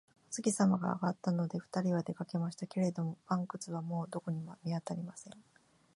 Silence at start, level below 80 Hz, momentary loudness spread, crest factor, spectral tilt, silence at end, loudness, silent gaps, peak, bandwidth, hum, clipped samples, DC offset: 0.3 s; -78 dBFS; 11 LU; 18 dB; -6.5 dB/octave; 0.55 s; -36 LUFS; none; -18 dBFS; 11.5 kHz; none; under 0.1%; under 0.1%